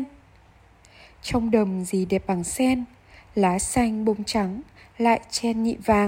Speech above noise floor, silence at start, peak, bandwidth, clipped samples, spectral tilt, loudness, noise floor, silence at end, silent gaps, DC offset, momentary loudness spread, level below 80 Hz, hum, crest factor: 31 dB; 0 s; -6 dBFS; 16 kHz; under 0.1%; -5 dB/octave; -24 LUFS; -54 dBFS; 0 s; none; under 0.1%; 9 LU; -46 dBFS; none; 18 dB